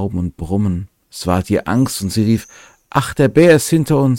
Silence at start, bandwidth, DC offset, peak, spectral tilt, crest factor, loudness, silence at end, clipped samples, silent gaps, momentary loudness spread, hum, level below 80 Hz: 0 s; 17 kHz; under 0.1%; 0 dBFS; -6 dB/octave; 16 dB; -16 LUFS; 0 s; under 0.1%; none; 12 LU; none; -40 dBFS